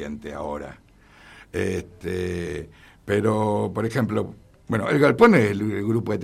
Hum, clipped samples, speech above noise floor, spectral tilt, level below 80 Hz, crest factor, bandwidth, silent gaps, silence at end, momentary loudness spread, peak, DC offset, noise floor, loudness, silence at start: none; under 0.1%; 27 dB; -7 dB/octave; -52 dBFS; 20 dB; 14.5 kHz; none; 0 s; 18 LU; -4 dBFS; under 0.1%; -50 dBFS; -23 LUFS; 0 s